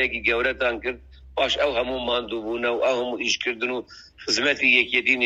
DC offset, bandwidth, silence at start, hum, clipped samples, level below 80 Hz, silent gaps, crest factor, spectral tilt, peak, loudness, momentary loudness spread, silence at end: under 0.1%; 10.5 kHz; 0 s; none; under 0.1%; -48 dBFS; none; 20 dB; -2 dB/octave; -4 dBFS; -22 LUFS; 13 LU; 0 s